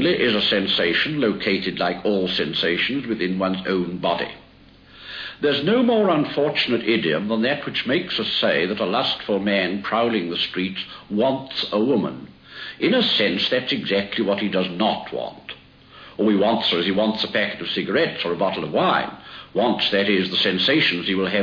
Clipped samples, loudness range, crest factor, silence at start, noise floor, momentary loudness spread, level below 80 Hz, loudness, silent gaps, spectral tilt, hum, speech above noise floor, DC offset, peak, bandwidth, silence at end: under 0.1%; 3 LU; 16 dB; 0 s; -49 dBFS; 10 LU; -58 dBFS; -21 LUFS; none; -6.5 dB/octave; none; 28 dB; under 0.1%; -6 dBFS; 5.4 kHz; 0 s